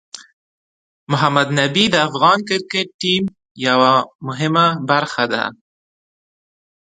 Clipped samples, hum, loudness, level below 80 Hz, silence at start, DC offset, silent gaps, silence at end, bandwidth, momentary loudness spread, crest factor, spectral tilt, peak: under 0.1%; none; -16 LUFS; -62 dBFS; 0.15 s; under 0.1%; 0.33-1.07 s, 2.94-2.99 s, 3.51-3.55 s, 4.15-4.19 s; 1.4 s; 10.5 kHz; 9 LU; 18 dB; -4.5 dB/octave; 0 dBFS